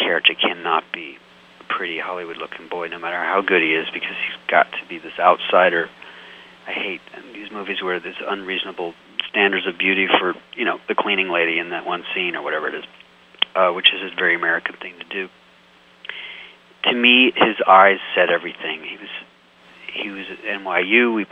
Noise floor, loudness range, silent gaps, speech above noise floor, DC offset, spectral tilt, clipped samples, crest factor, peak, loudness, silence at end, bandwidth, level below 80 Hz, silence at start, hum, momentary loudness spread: -51 dBFS; 7 LU; none; 31 dB; under 0.1%; -5.5 dB/octave; under 0.1%; 20 dB; 0 dBFS; -19 LUFS; 0.05 s; 8.2 kHz; -68 dBFS; 0 s; none; 18 LU